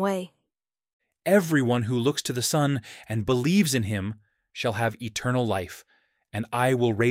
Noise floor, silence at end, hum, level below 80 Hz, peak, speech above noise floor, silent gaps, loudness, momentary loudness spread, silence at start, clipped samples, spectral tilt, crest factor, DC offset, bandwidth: -86 dBFS; 0 s; none; -60 dBFS; -10 dBFS; 62 dB; 0.93-1.00 s; -25 LUFS; 14 LU; 0 s; under 0.1%; -5 dB/octave; 16 dB; under 0.1%; 16.5 kHz